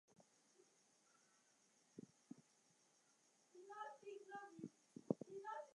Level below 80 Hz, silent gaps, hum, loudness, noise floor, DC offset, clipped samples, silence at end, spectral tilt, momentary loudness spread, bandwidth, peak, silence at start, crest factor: under -90 dBFS; none; none; -54 LUFS; -78 dBFS; under 0.1%; under 0.1%; 0 s; -6 dB/octave; 16 LU; 11 kHz; -24 dBFS; 0.1 s; 34 dB